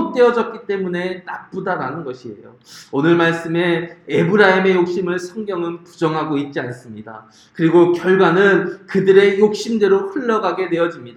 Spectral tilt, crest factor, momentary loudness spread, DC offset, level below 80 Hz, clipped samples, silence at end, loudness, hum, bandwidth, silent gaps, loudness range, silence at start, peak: -6.5 dB/octave; 16 dB; 16 LU; under 0.1%; -64 dBFS; under 0.1%; 0.05 s; -17 LUFS; none; 10 kHz; none; 6 LU; 0 s; 0 dBFS